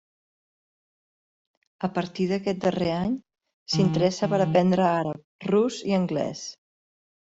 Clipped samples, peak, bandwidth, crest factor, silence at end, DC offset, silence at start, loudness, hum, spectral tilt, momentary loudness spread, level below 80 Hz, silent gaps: under 0.1%; -8 dBFS; 8 kHz; 18 dB; 0.75 s; under 0.1%; 1.8 s; -25 LUFS; none; -6.5 dB/octave; 11 LU; -60 dBFS; 3.53-3.66 s, 5.24-5.39 s